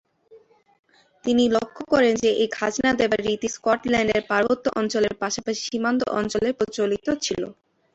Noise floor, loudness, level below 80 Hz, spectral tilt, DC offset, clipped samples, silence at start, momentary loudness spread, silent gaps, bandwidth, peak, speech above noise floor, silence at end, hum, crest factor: -53 dBFS; -23 LUFS; -54 dBFS; -4 dB/octave; under 0.1%; under 0.1%; 0.3 s; 6 LU; 0.79-0.83 s; 8.2 kHz; -6 dBFS; 31 dB; 0.4 s; none; 16 dB